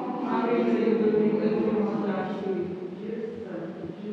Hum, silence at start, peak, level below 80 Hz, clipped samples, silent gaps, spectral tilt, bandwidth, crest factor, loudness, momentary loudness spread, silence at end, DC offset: none; 0 s; -12 dBFS; -72 dBFS; under 0.1%; none; -9 dB/octave; 6.4 kHz; 16 dB; -27 LUFS; 12 LU; 0 s; under 0.1%